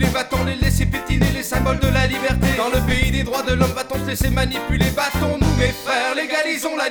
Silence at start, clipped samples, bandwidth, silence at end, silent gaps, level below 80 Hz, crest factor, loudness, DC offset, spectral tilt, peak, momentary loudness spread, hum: 0 s; under 0.1%; over 20 kHz; 0 s; none; -26 dBFS; 16 dB; -19 LUFS; under 0.1%; -5 dB/octave; -2 dBFS; 3 LU; none